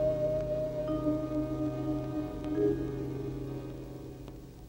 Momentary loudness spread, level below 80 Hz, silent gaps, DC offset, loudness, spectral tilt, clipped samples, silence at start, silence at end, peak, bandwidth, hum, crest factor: 14 LU; -48 dBFS; none; under 0.1%; -34 LUFS; -9 dB/octave; under 0.1%; 0 s; 0 s; -18 dBFS; 16 kHz; none; 16 dB